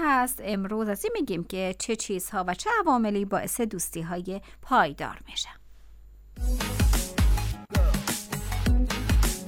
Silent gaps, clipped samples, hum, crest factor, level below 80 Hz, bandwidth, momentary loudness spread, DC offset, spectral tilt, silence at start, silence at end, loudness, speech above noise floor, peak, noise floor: none; under 0.1%; none; 18 dB; -30 dBFS; 17.5 kHz; 9 LU; under 0.1%; -4.5 dB/octave; 0 s; 0 s; -28 LUFS; 20 dB; -8 dBFS; -48 dBFS